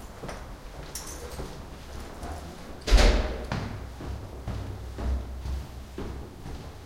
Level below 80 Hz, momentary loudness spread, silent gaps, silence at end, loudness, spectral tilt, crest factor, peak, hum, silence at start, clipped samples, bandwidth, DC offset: -32 dBFS; 17 LU; none; 0 s; -33 LUFS; -4.5 dB/octave; 22 dB; -8 dBFS; none; 0 s; under 0.1%; 16 kHz; under 0.1%